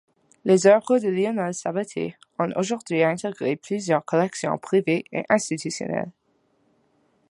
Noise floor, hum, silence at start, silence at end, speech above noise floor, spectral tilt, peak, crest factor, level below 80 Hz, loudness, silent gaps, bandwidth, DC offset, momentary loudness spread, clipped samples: -66 dBFS; none; 0.45 s; 1.2 s; 44 dB; -5.5 dB/octave; -4 dBFS; 20 dB; -70 dBFS; -23 LUFS; none; 11.5 kHz; under 0.1%; 11 LU; under 0.1%